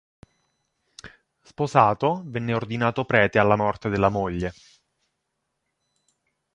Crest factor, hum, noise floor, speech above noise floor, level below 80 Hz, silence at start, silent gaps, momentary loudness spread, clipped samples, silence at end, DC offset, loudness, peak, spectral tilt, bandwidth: 24 dB; none; -78 dBFS; 56 dB; -50 dBFS; 1.05 s; none; 10 LU; under 0.1%; 2.05 s; under 0.1%; -23 LUFS; -2 dBFS; -7 dB/octave; 10 kHz